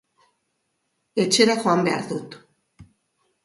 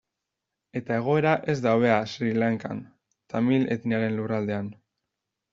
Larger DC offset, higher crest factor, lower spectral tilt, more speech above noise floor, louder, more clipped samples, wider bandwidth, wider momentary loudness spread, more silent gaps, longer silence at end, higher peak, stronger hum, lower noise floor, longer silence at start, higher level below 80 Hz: neither; about the same, 20 dB vs 20 dB; second, -3.5 dB/octave vs -6 dB/octave; second, 53 dB vs 60 dB; first, -21 LUFS vs -25 LUFS; neither; first, 11.5 kHz vs 7.4 kHz; about the same, 15 LU vs 14 LU; neither; second, 0.6 s vs 0.8 s; about the same, -4 dBFS vs -6 dBFS; neither; second, -74 dBFS vs -85 dBFS; first, 1.15 s vs 0.75 s; about the same, -66 dBFS vs -66 dBFS